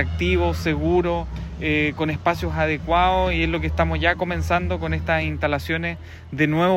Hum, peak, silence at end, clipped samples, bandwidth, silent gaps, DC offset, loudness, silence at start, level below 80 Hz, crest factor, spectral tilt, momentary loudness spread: none; -4 dBFS; 0 s; under 0.1%; 16 kHz; none; under 0.1%; -22 LUFS; 0 s; -32 dBFS; 16 dB; -6.5 dB/octave; 6 LU